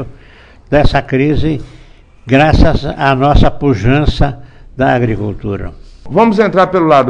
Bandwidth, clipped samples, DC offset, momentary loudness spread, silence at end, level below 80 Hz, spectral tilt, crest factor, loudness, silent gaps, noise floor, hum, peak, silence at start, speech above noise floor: 9.4 kHz; 0.3%; under 0.1%; 12 LU; 0 s; -20 dBFS; -7.5 dB/octave; 12 dB; -12 LUFS; none; -39 dBFS; none; 0 dBFS; 0 s; 29 dB